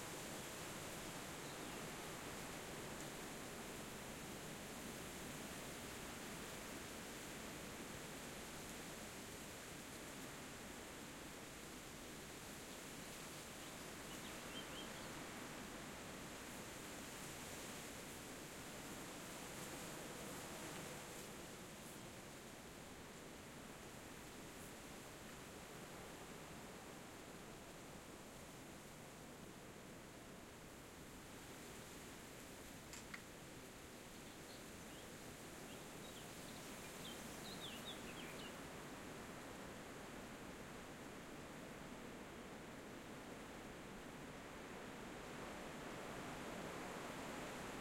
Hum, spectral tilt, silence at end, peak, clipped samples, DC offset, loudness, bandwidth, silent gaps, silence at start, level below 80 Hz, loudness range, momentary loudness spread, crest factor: none; -3 dB/octave; 0 s; -34 dBFS; under 0.1%; under 0.1%; -52 LUFS; 16.5 kHz; none; 0 s; -68 dBFS; 5 LU; 6 LU; 20 dB